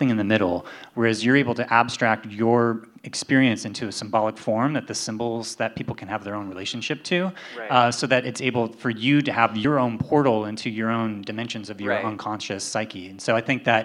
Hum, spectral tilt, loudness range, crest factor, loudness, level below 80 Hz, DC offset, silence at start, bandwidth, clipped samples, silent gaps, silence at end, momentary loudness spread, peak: none; -5 dB/octave; 5 LU; 22 dB; -23 LUFS; -66 dBFS; under 0.1%; 0 s; 12 kHz; under 0.1%; none; 0 s; 11 LU; -2 dBFS